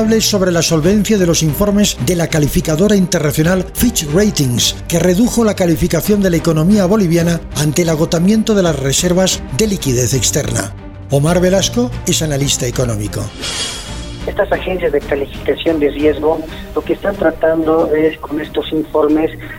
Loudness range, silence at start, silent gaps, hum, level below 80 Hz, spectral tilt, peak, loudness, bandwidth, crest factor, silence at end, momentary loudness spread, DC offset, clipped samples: 4 LU; 0 s; none; none; -30 dBFS; -4.5 dB/octave; 0 dBFS; -14 LUFS; 16.5 kHz; 12 dB; 0 s; 8 LU; under 0.1%; under 0.1%